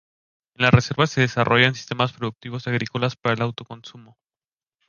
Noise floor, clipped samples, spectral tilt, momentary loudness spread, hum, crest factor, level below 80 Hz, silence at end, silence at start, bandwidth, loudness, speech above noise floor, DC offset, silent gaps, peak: under -90 dBFS; under 0.1%; -5.5 dB/octave; 14 LU; none; 22 dB; -48 dBFS; 0.85 s; 0.6 s; 7.2 kHz; -21 LUFS; over 68 dB; under 0.1%; none; -2 dBFS